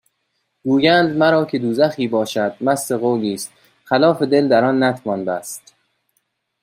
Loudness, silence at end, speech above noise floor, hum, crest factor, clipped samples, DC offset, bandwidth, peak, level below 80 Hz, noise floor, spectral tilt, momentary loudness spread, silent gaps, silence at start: -17 LUFS; 1.05 s; 54 dB; none; 16 dB; under 0.1%; under 0.1%; 16 kHz; -2 dBFS; -64 dBFS; -71 dBFS; -5 dB/octave; 12 LU; none; 0.65 s